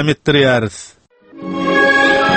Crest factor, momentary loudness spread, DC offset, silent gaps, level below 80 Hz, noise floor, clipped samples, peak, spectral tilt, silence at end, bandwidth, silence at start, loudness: 14 dB; 18 LU; under 0.1%; none; -46 dBFS; -35 dBFS; under 0.1%; 0 dBFS; -5 dB/octave; 0 s; 8.8 kHz; 0 s; -12 LUFS